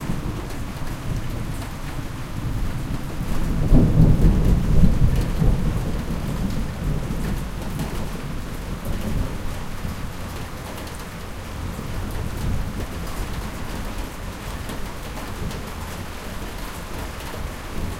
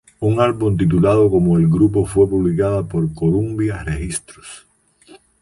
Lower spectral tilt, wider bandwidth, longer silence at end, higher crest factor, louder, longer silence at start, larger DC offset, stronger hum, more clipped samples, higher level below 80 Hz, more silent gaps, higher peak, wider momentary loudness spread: about the same, -6.5 dB/octave vs -7.5 dB/octave; first, 16.5 kHz vs 11.5 kHz; second, 0 s vs 0.85 s; first, 20 dB vs 14 dB; second, -26 LUFS vs -17 LUFS; second, 0 s vs 0.2 s; neither; neither; neither; first, -26 dBFS vs -36 dBFS; neither; about the same, -2 dBFS vs -4 dBFS; first, 14 LU vs 11 LU